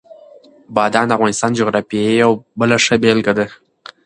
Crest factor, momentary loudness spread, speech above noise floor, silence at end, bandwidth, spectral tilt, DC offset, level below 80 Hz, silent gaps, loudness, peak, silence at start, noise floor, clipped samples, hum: 16 dB; 6 LU; 29 dB; 0.5 s; 11 kHz; -4.5 dB/octave; under 0.1%; -54 dBFS; none; -15 LUFS; 0 dBFS; 0.1 s; -43 dBFS; under 0.1%; none